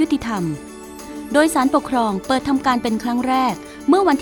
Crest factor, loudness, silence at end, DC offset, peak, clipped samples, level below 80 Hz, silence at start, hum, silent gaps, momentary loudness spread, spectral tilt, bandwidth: 18 dB; -19 LUFS; 0 s; under 0.1%; -2 dBFS; under 0.1%; -46 dBFS; 0 s; none; none; 16 LU; -5 dB/octave; 19 kHz